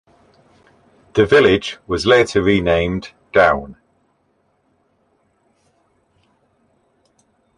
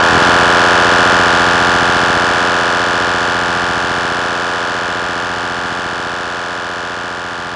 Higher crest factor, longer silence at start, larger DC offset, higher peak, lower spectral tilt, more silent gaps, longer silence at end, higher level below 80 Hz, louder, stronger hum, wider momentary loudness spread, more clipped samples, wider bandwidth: first, 20 dB vs 14 dB; first, 1.15 s vs 0 s; neither; about the same, 0 dBFS vs 0 dBFS; first, -5.5 dB/octave vs -3 dB/octave; neither; first, 3.85 s vs 0 s; about the same, -42 dBFS vs -40 dBFS; second, -16 LUFS vs -13 LUFS; neither; about the same, 11 LU vs 11 LU; neither; about the same, 11 kHz vs 11.5 kHz